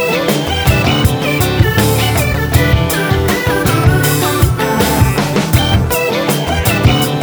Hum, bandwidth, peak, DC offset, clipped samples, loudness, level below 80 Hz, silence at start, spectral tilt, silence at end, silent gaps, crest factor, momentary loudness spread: none; over 20 kHz; 0 dBFS; under 0.1%; under 0.1%; -12 LUFS; -22 dBFS; 0 s; -5 dB/octave; 0 s; none; 12 dB; 3 LU